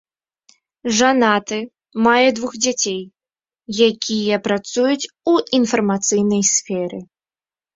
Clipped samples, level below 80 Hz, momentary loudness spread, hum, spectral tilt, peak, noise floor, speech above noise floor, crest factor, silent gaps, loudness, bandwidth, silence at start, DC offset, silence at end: under 0.1%; -60 dBFS; 13 LU; none; -3 dB/octave; -2 dBFS; under -90 dBFS; over 73 dB; 18 dB; none; -17 LUFS; 8 kHz; 0.85 s; under 0.1%; 0.7 s